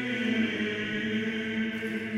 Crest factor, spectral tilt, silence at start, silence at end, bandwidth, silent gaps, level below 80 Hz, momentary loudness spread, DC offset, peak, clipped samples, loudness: 16 dB; -5.5 dB/octave; 0 s; 0 s; 11.5 kHz; none; -64 dBFS; 3 LU; under 0.1%; -14 dBFS; under 0.1%; -30 LUFS